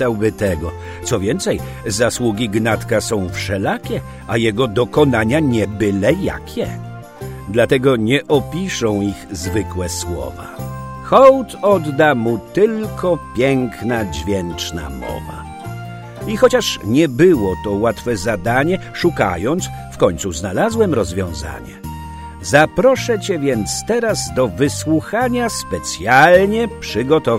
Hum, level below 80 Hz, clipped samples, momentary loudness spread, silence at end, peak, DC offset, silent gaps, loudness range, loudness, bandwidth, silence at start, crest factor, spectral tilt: none; -38 dBFS; under 0.1%; 15 LU; 0 s; 0 dBFS; under 0.1%; none; 4 LU; -17 LUFS; 16 kHz; 0 s; 16 dB; -5 dB/octave